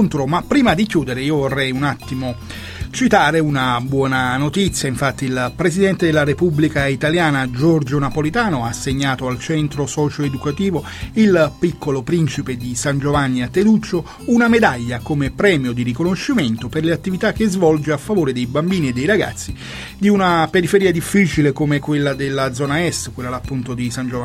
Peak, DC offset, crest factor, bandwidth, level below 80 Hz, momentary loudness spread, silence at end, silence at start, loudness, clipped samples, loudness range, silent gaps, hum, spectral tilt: 0 dBFS; under 0.1%; 18 dB; 16 kHz; -38 dBFS; 9 LU; 0 s; 0 s; -17 LUFS; under 0.1%; 2 LU; none; none; -5.5 dB/octave